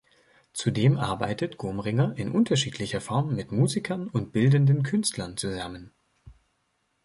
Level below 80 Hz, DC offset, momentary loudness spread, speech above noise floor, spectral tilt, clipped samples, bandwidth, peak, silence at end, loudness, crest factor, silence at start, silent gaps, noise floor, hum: -56 dBFS; under 0.1%; 10 LU; 48 dB; -6 dB/octave; under 0.1%; 11.5 kHz; -10 dBFS; 0.75 s; -26 LUFS; 18 dB; 0.55 s; none; -73 dBFS; none